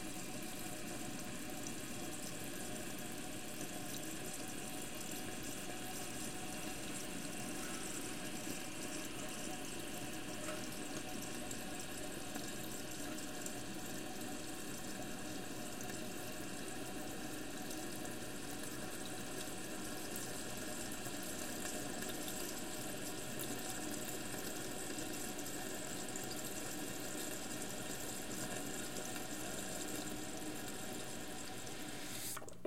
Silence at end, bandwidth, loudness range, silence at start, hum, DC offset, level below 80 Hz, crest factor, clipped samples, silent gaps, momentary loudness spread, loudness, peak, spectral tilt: 0 s; 17 kHz; 2 LU; 0 s; none; 0.4%; -64 dBFS; 18 dB; under 0.1%; none; 3 LU; -44 LUFS; -26 dBFS; -3 dB/octave